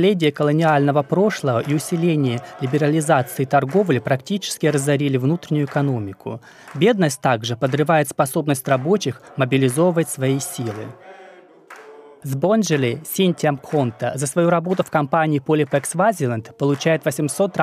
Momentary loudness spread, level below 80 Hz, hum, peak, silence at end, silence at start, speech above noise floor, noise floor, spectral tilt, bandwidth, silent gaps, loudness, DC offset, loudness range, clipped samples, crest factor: 7 LU; -66 dBFS; none; -2 dBFS; 0 s; 0 s; 26 dB; -45 dBFS; -5.5 dB/octave; 15.5 kHz; none; -19 LUFS; under 0.1%; 4 LU; under 0.1%; 16 dB